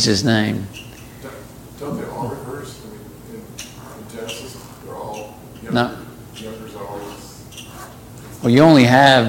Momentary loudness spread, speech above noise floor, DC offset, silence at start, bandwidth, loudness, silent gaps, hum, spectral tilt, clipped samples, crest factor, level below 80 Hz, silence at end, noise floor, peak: 25 LU; 25 dB; under 0.1%; 0 s; 17 kHz; -16 LUFS; none; none; -5 dB/octave; under 0.1%; 20 dB; -48 dBFS; 0 s; -37 dBFS; 0 dBFS